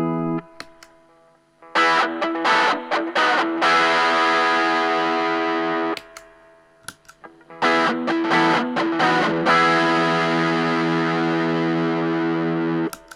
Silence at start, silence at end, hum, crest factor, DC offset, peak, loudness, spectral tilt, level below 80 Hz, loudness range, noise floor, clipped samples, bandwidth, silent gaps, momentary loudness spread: 0 s; 0.15 s; none; 14 dB; under 0.1%; -6 dBFS; -19 LUFS; -5 dB/octave; -68 dBFS; 5 LU; -56 dBFS; under 0.1%; 13 kHz; none; 8 LU